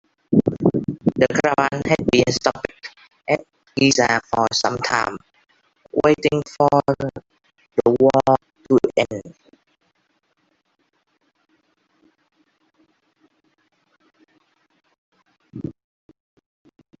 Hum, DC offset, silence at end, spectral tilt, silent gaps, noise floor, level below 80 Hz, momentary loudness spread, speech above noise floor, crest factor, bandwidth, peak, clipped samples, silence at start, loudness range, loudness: none; under 0.1%; 1.3 s; -5 dB/octave; 14.98-15.12 s; -68 dBFS; -54 dBFS; 18 LU; 50 dB; 22 dB; 8 kHz; 0 dBFS; under 0.1%; 0.3 s; 5 LU; -19 LUFS